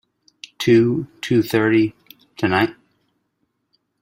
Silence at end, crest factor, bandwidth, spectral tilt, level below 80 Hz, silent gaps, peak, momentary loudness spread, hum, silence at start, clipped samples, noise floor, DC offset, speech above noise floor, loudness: 1.3 s; 18 dB; 16 kHz; -6.5 dB/octave; -56 dBFS; none; -2 dBFS; 9 LU; none; 0.6 s; under 0.1%; -71 dBFS; under 0.1%; 55 dB; -19 LUFS